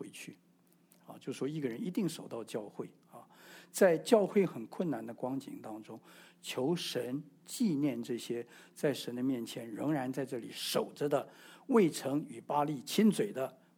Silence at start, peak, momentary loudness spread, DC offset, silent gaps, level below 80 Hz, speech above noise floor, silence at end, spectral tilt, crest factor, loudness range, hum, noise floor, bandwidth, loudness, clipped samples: 0 s; -12 dBFS; 19 LU; under 0.1%; none; -86 dBFS; 33 dB; 0.25 s; -5.5 dB/octave; 24 dB; 6 LU; none; -68 dBFS; 19.5 kHz; -34 LUFS; under 0.1%